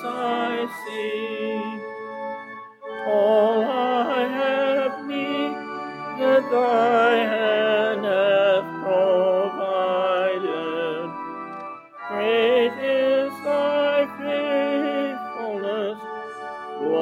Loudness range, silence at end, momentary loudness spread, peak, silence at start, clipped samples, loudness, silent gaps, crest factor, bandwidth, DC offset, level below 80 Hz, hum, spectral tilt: 5 LU; 0 s; 15 LU; -6 dBFS; 0 s; under 0.1%; -22 LUFS; none; 16 dB; 12.5 kHz; under 0.1%; -78 dBFS; none; -5.5 dB/octave